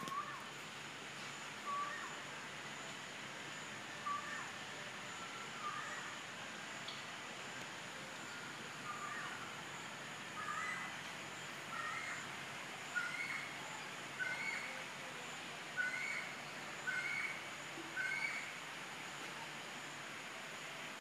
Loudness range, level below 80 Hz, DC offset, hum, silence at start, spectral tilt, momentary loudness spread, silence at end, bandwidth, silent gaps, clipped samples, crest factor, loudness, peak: 4 LU; -86 dBFS; under 0.1%; none; 0 s; -2 dB/octave; 7 LU; 0 s; 15.5 kHz; none; under 0.1%; 20 dB; -44 LUFS; -26 dBFS